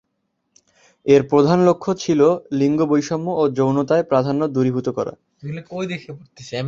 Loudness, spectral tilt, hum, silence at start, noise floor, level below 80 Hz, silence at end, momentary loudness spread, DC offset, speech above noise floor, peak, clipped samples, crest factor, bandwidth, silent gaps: -18 LUFS; -7 dB/octave; none; 1.05 s; -73 dBFS; -58 dBFS; 0 s; 16 LU; under 0.1%; 54 dB; -2 dBFS; under 0.1%; 18 dB; 7.6 kHz; none